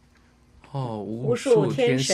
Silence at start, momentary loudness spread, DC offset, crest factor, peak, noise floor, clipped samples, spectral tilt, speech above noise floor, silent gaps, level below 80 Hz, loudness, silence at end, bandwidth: 0.75 s; 12 LU; under 0.1%; 16 dB; -8 dBFS; -57 dBFS; under 0.1%; -5 dB/octave; 35 dB; none; -60 dBFS; -24 LUFS; 0 s; 13 kHz